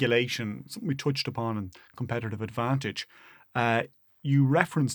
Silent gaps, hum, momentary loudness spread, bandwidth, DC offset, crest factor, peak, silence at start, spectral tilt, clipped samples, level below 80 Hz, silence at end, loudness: none; none; 14 LU; 19.5 kHz; under 0.1%; 24 dB; -4 dBFS; 0 s; -6 dB/octave; under 0.1%; -66 dBFS; 0 s; -29 LUFS